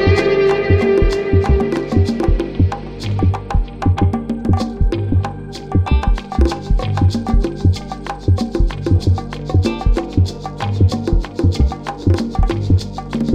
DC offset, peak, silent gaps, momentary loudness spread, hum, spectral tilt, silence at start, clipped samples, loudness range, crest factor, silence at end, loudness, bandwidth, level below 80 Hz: 0.4%; 0 dBFS; none; 6 LU; none; -7.5 dB/octave; 0 s; under 0.1%; 2 LU; 14 dB; 0 s; -17 LUFS; 9.2 kHz; -20 dBFS